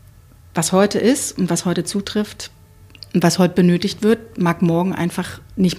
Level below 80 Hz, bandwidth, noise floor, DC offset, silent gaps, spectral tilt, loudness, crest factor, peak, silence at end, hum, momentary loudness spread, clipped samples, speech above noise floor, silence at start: -50 dBFS; 15.5 kHz; -45 dBFS; under 0.1%; none; -5.5 dB/octave; -18 LUFS; 16 dB; -2 dBFS; 0 s; none; 12 LU; under 0.1%; 28 dB; 0.55 s